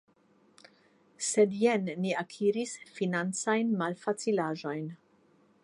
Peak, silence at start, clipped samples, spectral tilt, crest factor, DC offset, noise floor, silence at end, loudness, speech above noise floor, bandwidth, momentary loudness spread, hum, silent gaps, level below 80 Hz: -14 dBFS; 1.2 s; under 0.1%; -4.5 dB/octave; 18 dB; under 0.1%; -66 dBFS; 0.7 s; -30 LUFS; 36 dB; 11.5 kHz; 9 LU; none; none; -82 dBFS